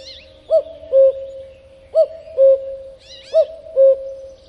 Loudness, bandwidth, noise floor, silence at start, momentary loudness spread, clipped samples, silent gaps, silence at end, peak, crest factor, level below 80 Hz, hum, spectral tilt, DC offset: -16 LUFS; 6 kHz; -43 dBFS; 0.05 s; 20 LU; under 0.1%; none; 0.2 s; -4 dBFS; 14 dB; -54 dBFS; none; -4.5 dB/octave; under 0.1%